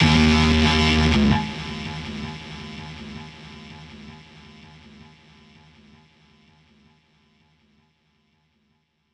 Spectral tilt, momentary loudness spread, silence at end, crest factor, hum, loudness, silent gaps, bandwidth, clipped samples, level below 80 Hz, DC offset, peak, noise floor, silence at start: -5.5 dB/octave; 25 LU; 5 s; 20 dB; none; -20 LUFS; none; 10.5 kHz; under 0.1%; -34 dBFS; under 0.1%; -4 dBFS; -69 dBFS; 0 s